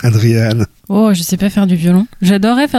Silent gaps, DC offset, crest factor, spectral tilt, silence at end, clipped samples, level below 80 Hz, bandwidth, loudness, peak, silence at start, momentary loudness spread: none; under 0.1%; 10 dB; -6.5 dB/octave; 0 s; under 0.1%; -42 dBFS; 15.5 kHz; -12 LUFS; 0 dBFS; 0 s; 4 LU